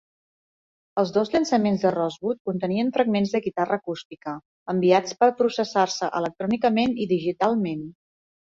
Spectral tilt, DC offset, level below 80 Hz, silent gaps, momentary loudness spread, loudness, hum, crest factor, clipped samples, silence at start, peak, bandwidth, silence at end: -5.5 dB/octave; under 0.1%; -64 dBFS; 2.40-2.45 s, 4.05-4.10 s, 4.45-4.66 s; 13 LU; -23 LUFS; none; 18 dB; under 0.1%; 0.95 s; -6 dBFS; 7.8 kHz; 0.55 s